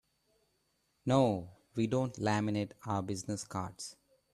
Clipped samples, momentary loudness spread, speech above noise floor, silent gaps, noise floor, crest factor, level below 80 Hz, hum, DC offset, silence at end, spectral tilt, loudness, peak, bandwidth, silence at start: under 0.1%; 13 LU; 44 dB; none; -77 dBFS; 20 dB; -68 dBFS; none; under 0.1%; 0.4 s; -6 dB/octave; -34 LUFS; -16 dBFS; 13 kHz; 1.05 s